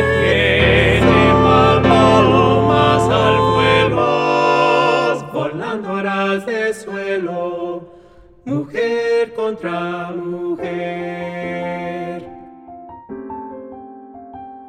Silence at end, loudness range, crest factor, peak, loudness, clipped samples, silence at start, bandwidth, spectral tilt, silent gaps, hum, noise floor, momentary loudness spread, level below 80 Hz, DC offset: 0 s; 14 LU; 16 dB; -2 dBFS; -16 LUFS; under 0.1%; 0 s; 12 kHz; -6 dB/octave; none; none; -44 dBFS; 20 LU; -36 dBFS; under 0.1%